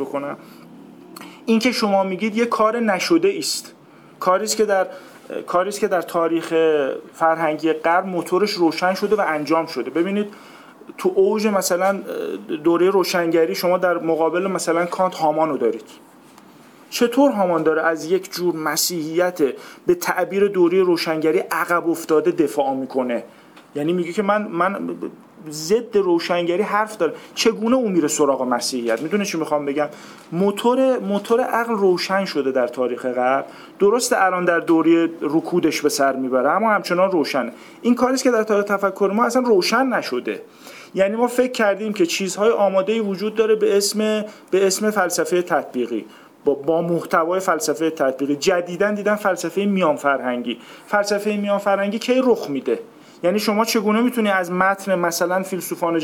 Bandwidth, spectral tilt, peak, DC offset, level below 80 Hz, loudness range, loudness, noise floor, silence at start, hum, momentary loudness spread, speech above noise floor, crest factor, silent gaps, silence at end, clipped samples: 19 kHz; -4 dB/octave; -2 dBFS; under 0.1%; -68 dBFS; 2 LU; -20 LUFS; -46 dBFS; 0 s; none; 8 LU; 27 dB; 16 dB; none; 0 s; under 0.1%